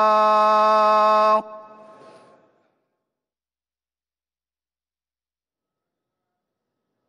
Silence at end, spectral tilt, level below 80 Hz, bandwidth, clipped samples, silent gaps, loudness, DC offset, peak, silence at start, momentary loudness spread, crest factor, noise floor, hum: 5.5 s; -4 dB/octave; -80 dBFS; 9.6 kHz; under 0.1%; none; -17 LUFS; under 0.1%; -8 dBFS; 0 s; 3 LU; 14 dB; under -90 dBFS; none